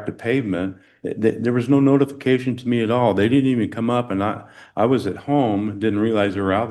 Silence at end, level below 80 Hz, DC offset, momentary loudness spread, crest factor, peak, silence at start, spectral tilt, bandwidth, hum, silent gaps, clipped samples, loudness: 0 s; -62 dBFS; under 0.1%; 8 LU; 16 dB; -4 dBFS; 0 s; -8 dB/octave; 12 kHz; none; none; under 0.1%; -20 LUFS